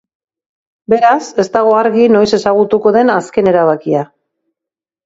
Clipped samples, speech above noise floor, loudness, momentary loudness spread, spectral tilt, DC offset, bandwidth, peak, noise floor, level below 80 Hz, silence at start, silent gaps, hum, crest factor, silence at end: under 0.1%; 75 dB; -11 LUFS; 6 LU; -6 dB/octave; under 0.1%; 8 kHz; 0 dBFS; -85 dBFS; -54 dBFS; 0.9 s; none; none; 12 dB; 1 s